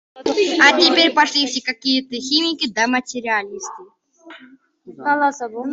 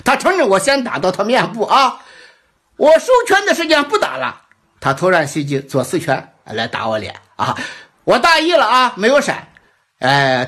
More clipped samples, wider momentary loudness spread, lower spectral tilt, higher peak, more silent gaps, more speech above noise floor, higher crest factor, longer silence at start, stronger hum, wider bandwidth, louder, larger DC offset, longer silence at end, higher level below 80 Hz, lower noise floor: neither; about the same, 13 LU vs 12 LU; second, -1 dB/octave vs -4 dB/octave; about the same, 0 dBFS vs -2 dBFS; neither; second, 30 dB vs 39 dB; first, 18 dB vs 12 dB; about the same, 0.15 s vs 0.05 s; neither; second, 8 kHz vs 15.5 kHz; about the same, -17 LUFS vs -15 LUFS; neither; about the same, 0 s vs 0 s; second, -64 dBFS vs -54 dBFS; second, -48 dBFS vs -53 dBFS